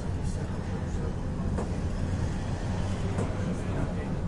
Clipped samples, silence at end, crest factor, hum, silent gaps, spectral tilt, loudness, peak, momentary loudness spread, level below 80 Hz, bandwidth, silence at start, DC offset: under 0.1%; 0 s; 14 dB; none; none; -7 dB/octave; -32 LUFS; -16 dBFS; 2 LU; -36 dBFS; 11 kHz; 0 s; under 0.1%